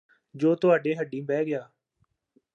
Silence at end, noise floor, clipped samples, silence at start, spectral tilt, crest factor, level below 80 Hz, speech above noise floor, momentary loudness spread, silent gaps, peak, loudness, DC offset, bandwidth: 0.9 s; -73 dBFS; under 0.1%; 0.35 s; -8 dB/octave; 18 dB; -82 dBFS; 48 dB; 9 LU; none; -8 dBFS; -26 LUFS; under 0.1%; 7.4 kHz